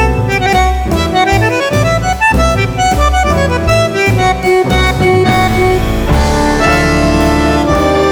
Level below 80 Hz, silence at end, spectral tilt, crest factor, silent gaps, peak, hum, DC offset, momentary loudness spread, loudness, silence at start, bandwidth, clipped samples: -18 dBFS; 0 s; -5.5 dB/octave; 10 dB; none; 0 dBFS; none; under 0.1%; 2 LU; -11 LUFS; 0 s; over 20 kHz; under 0.1%